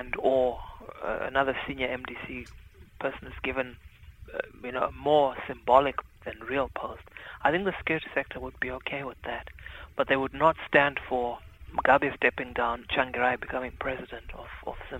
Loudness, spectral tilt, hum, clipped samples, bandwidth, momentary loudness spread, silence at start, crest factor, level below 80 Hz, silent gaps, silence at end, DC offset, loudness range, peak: -28 LUFS; -6.5 dB/octave; none; under 0.1%; 16 kHz; 17 LU; 0 s; 24 dB; -50 dBFS; none; 0 s; under 0.1%; 7 LU; -6 dBFS